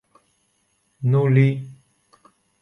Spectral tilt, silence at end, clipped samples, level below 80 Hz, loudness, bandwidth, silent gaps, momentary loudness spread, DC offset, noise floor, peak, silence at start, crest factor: -10 dB/octave; 0.9 s; under 0.1%; -64 dBFS; -20 LUFS; 4 kHz; none; 16 LU; under 0.1%; -67 dBFS; -4 dBFS; 1 s; 18 dB